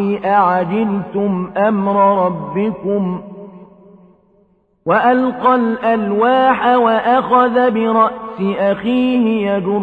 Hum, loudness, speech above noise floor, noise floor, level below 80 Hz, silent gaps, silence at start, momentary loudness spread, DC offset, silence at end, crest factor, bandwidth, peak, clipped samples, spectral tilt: none; -15 LUFS; 42 dB; -56 dBFS; -54 dBFS; none; 0 s; 7 LU; under 0.1%; 0 s; 14 dB; 4.8 kHz; 0 dBFS; under 0.1%; -9 dB/octave